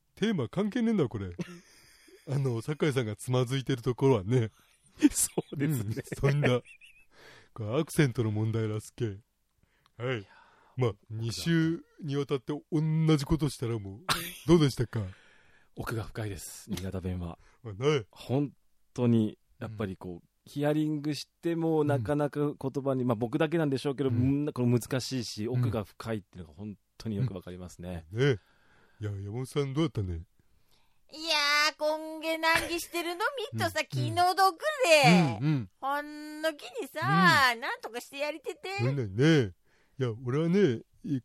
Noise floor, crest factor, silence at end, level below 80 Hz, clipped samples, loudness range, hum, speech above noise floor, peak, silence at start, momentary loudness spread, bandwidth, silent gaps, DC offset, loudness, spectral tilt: -72 dBFS; 22 dB; 0.05 s; -56 dBFS; under 0.1%; 8 LU; none; 42 dB; -8 dBFS; 0.2 s; 15 LU; 16 kHz; none; under 0.1%; -29 LUFS; -5.5 dB/octave